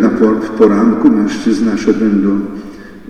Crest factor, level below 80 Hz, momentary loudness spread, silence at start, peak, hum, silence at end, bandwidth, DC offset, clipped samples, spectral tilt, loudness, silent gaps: 12 dB; -44 dBFS; 11 LU; 0 s; 0 dBFS; none; 0 s; 9.6 kHz; under 0.1%; under 0.1%; -7 dB/octave; -12 LUFS; none